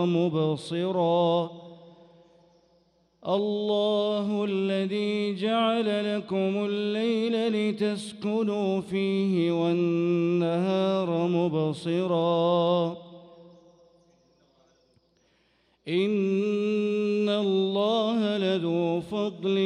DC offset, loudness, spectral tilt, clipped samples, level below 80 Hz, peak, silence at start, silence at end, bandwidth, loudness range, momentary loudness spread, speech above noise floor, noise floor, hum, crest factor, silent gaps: under 0.1%; -26 LUFS; -7 dB/octave; under 0.1%; -72 dBFS; -12 dBFS; 0 s; 0 s; 11 kHz; 5 LU; 5 LU; 42 dB; -67 dBFS; none; 14 dB; none